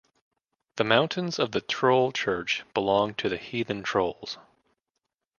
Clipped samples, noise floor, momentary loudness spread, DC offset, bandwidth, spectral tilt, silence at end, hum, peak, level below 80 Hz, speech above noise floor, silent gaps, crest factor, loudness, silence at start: under 0.1%; -83 dBFS; 9 LU; under 0.1%; 7.2 kHz; -4.5 dB/octave; 1 s; none; -4 dBFS; -62 dBFS; 57 dB; none; 24 dB; -26 LUFS; 0.75 s